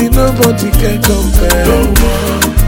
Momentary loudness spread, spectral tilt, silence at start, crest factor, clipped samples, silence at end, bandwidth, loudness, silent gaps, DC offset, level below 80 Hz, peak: 3 LU; -5 dB/octave; 0 s; 8 dB; 0.2%; 0 s; 17.5 kHz; -11 LUFS; none; under 0.1%; -12 dBFS; 0 dBFS